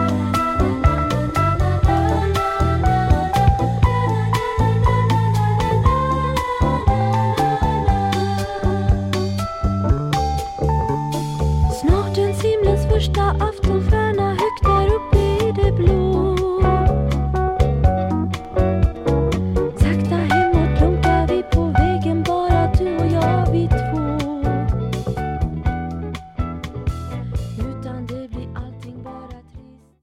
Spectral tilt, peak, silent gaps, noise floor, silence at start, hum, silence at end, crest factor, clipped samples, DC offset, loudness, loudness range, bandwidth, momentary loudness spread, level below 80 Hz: -7.5 dB/octave; -2 dBFS; none; -43 dBFS; 0 s; none; 0.4 s; 16 dB; under 0.1%; under 0.1%; -19 LUFS; 7 LU; 15 kHz; 10 LU; -24 dBFS